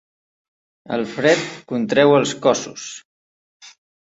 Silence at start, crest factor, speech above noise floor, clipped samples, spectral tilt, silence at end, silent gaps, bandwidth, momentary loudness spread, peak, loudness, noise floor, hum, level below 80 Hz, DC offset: 0.9 s; 20 dB; over 72 dB; under 0.1%; -4.5 dB/octave; 0.45 s; 3.05-3.60 s; 8 kHz; 18 LU; -2 dBFS; -18 LUFS; under -90 dBFS; none; -64 dBFS; under 0.1%